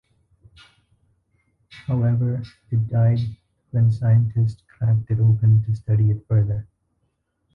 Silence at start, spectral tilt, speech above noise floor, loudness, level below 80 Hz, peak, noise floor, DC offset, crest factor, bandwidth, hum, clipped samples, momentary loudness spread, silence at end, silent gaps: 1.75 s; -10.5 dB/octave; 52 dB; -21 LUFS; -46 dBFS; -8 dBFS; -71 dBFS; under 0.1%; 12 dB; 4.5 kHz; none; under 0.1%; 9 LU; 0.9 s; none